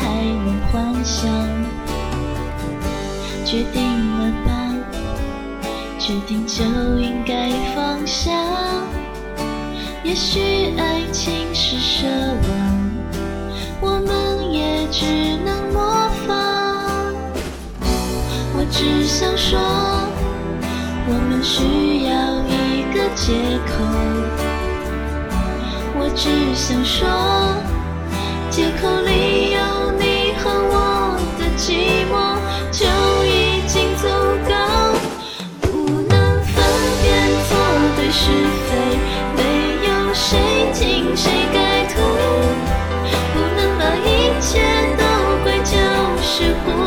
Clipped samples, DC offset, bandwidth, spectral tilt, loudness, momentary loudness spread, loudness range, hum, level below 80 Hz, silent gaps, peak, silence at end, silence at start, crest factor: under 0.1%; under 0.1%; 19.5 kHz; -4.5 dB/octave; -18 LUFS; 9 LU; 6 LU; none; -26 dBFS; none; -2 dBFS; 0 s; 0 s; 16 dB